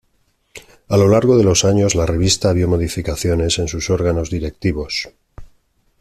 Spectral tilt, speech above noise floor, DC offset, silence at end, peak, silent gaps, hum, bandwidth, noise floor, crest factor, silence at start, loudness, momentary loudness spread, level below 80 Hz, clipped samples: -5 dB/octave; 46 dB; under 0.1%; 0.55 s; -2 dBFS; none; none; 14 kHz; -62 dBFS; 16 dB; 0.55 s; -16 LUFS; 10 LU; -34 dBFS; under 0.1%